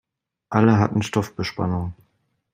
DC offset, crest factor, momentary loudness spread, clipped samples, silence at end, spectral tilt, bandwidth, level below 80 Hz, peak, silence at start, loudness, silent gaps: under 0.1%; 20 dB; 11 LU; under 0.1%; 0.6 s; -7 dB/octave; 15 kHz; -54 dBFS; -2 dBFS; 0.5 s; -22 LUFS; none